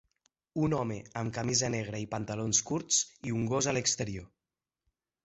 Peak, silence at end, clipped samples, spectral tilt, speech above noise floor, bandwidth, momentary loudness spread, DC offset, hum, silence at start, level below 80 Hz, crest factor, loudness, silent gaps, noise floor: -10 dBFS; 1 s; under 0.1%; -3.5 dB/octave; over 58 dB; 8.4 kHz; 8 LU; under 0.1%; none; 0.55 s; -60 dBFS; 22 dB; -31 LUFS; none; under -90 dBFS